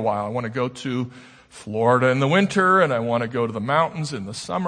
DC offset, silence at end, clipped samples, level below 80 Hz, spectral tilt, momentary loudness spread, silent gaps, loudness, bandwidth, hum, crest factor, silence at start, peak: under 0.1%; 0 s; under 0.1%; -62 dBFS; -6 dB/octave; 12 LU; none; -21 LUFS; 9.8 kHz; none; 18 dB; 0 s; -4 dBFS